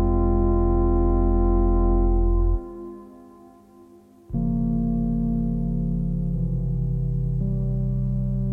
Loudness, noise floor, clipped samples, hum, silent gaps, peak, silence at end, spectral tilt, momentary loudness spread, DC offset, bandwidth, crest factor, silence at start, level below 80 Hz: -24 LUFS; -50 dBFS; under 0.1%; 50 Hz at -60 dBFS; none; -10 dBFS; 0 s; -13 dB/octave; 5 LU; under 0.1%; 1.8 kHz; 12 dB; 0 s; -24 dBFS